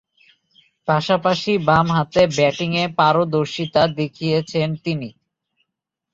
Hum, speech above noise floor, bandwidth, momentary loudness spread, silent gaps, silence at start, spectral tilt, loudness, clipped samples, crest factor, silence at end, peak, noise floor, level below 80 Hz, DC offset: none; 63 dB; 7.8 kHz; 8 LU; none; 0.85 s; -6 dB/octave; -19 LUFS; under 0.1%; 18 dB; 1.05 s; -2 dBFS; -81 dBFS; -52 dBFS; under 0.1%